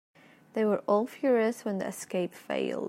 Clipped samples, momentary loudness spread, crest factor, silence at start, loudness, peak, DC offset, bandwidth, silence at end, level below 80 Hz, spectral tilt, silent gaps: under 0.1%; 7 LU; 18 dB; 0.55 s; -30 LUFS; -12 dBFS; under 0.1%; 16 kHz; 0 s; -80 dBFS; -5.5 dB/octave; none